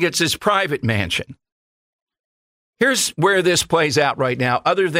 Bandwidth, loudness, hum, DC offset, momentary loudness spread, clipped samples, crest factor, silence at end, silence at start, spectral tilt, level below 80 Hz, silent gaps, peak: 16 kHz; -18 LUFS; none; under 0.1%; 4 LU; under 0.1%; 16 dB; 0 s; 0 s; -3.5 dB/octave; -52 dBFS; 1.52-2.07 s, 2.19-2.73 s; -4 dBFS